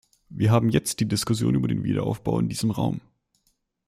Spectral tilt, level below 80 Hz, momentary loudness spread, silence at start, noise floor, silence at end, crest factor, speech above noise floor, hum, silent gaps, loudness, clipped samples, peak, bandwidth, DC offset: -6 dB/octave; -50 dBFS; 7 LU; 0.3 s; -71 dBFS; 0.9 s; 18 dB; 48 dB; none; none; -24 LUFS; under 0.1%; -6 dBFS; 15.5 kHz; under 0.1%